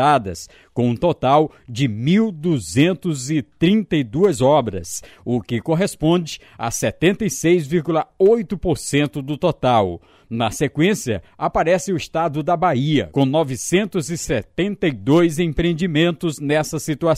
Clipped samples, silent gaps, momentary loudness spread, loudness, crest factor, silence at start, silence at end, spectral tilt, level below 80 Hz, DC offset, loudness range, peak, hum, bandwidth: under 0.1%; none; 8 LU; -19 LUFS; 16 dB; 0 s; 0 s; -5.5 dB/octave; -44 dBFS; under 0.1%; 2 LU; -4 dBFS; none; 15.5 kHz